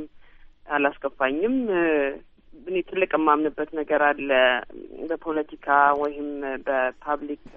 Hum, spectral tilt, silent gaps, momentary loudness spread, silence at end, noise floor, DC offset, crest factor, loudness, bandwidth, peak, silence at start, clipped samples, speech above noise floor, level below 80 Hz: none; -1.5 dB/octave; none; 11 LU; 0 s; -48 dBFS; under 0.1%; 20 dB; -24 LUFS; 4.4 kHz; -4 dBFS; 0 s; under 0.1%; 24 dB; -54 dBFS